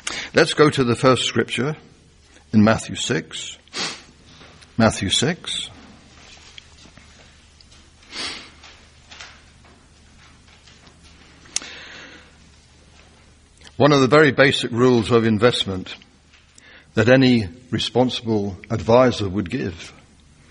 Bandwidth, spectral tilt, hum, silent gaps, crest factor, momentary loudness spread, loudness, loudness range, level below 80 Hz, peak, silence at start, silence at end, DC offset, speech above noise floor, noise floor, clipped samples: 10.5 kHz; -5 dB/octave; none; none; 22 dB; 22 LU; -19 LUFS; 19 LU; -50 dBFS; 0 dBFS; 0.05 s; 0.6 s; under 0.1%; 34 dB; -52 dBFS; under 0.1%